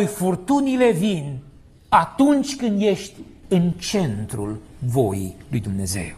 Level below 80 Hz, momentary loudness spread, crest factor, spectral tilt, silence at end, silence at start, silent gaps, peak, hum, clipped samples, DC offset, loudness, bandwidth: -48 dBFS; 11 LU; 20 dB; -6 dB/octave; 0 s; 0 s; none; -2 dBFS; none; under 0.1%; under 0.1%; -21 LUFS; 14 kHz